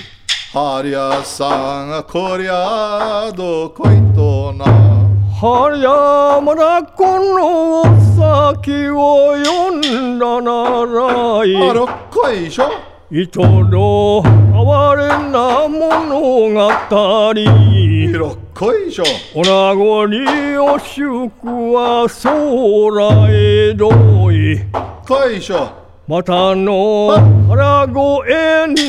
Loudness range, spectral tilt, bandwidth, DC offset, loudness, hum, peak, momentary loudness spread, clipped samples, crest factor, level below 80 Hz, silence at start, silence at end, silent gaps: 3 LU; -7 dB/octave; 10.5 kHz; under 0.1%; -12 LUFS; none; 0 dBFS; 10 LU; under 0.1%; 12 dB; -34 dBFS; 0 s; 0 s; none